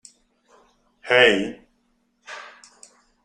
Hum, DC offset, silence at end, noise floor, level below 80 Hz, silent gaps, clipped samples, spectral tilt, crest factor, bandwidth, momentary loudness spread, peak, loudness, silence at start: none; under 0.1%; 0.8 s; -67 dBFS; -60 dBFS; none; under 0.1%; -3.5 dB/octave; 24 dB; 10.5 kHz; 24 LU; -2 dBFS; -18 LUFS; 1.05 s